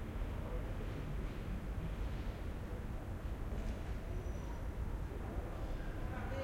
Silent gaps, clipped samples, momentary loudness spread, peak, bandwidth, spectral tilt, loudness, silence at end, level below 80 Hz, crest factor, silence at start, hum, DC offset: none; under 0.1%; 2 LU; -30 dBFS; 16 kHz; -7 dB/octave; -45 LUFS; 0 s; -44 dBFS; 12 dB; 0 s; none; under 0.1%